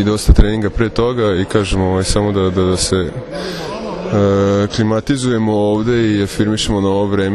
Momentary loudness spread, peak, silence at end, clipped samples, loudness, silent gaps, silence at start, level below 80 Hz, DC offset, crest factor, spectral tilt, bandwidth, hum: 10 LU; 0 dBFS; 0 s; 0.2%; -15 LUFS; none; 0 s; -22 dBFS; under 0.1%; 14 dB; -5.5 dB/octave; 13 kHz; none